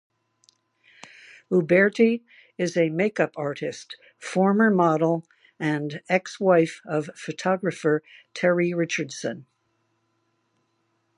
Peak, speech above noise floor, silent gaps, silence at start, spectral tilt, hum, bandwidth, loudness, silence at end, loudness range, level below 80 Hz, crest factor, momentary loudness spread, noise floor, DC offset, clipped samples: -6 dBFS; 48 dB; none; 1.5 s; -6 dB/octave; none; 11 kHz; -24 LUFS; 1.75 s; 4 LU; -76 dBFS; 20 dB; 13 LU; -72 dBFS; under 0.1%; under 0.1%